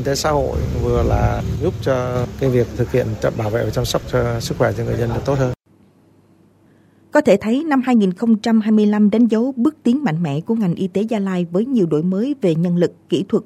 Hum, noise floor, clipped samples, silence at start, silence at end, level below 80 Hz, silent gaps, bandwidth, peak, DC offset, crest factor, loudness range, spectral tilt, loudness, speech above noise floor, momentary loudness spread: none; -53 dBFS; under 0.1%; 0 s; 0 s; -34 dBFS; none; 14.5 kHz; -2 dBFS; under 0.1%; 16 dB; 5 LU; -7 dB/octave; -18 LUFS; 36 dB; 6 LU